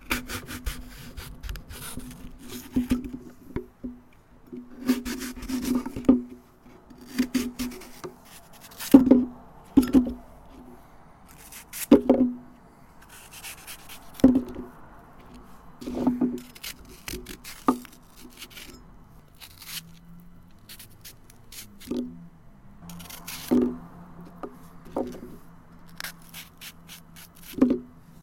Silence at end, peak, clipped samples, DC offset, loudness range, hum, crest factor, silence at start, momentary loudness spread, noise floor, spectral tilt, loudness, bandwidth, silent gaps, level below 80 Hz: 0.35 s; 0 dBFS; under 0.1%; under 0.1%; 16 LU; none; 28 dB; 0.05 s; 26 LU; -53 dBFS; -5 dB/octave; -26 LUFS; 17 kHz; none; -48 dBFS